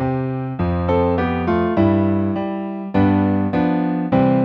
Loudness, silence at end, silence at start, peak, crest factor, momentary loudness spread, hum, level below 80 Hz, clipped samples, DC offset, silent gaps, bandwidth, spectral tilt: -19 LUFS; 0 s; 0 s; -2 dBFS; 16 dB; 7 LU; none; -40 dBFS; under 0.1%; under 0.1%; none; 5.4 kHz; -10.5 dB/octave